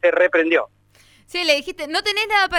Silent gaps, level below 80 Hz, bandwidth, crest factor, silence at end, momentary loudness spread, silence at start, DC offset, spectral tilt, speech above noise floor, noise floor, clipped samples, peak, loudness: none; -54 dBFS; 16 kHz; 16 dB; 0 s; 9 LU; 0.05 s; under 0.1%; -1.5 dB/octave; 35 dB; -54 dBFS; under 0.1%; -4 dBFS; -19 LUFS